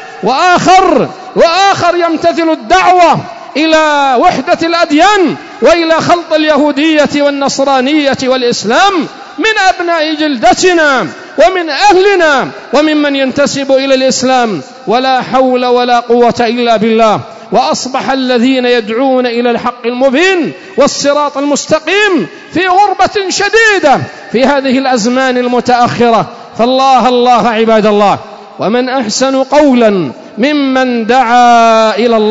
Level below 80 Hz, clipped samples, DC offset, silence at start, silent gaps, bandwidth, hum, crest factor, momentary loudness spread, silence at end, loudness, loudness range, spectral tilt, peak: -44 dBFS; 0.2%; 0.2%; 0 s; none; 8 kHz; none; 8 dB; 7 LU; 0 s; -9 LUFS; 2 LU; -3.5 dB/octave; 0 dBFS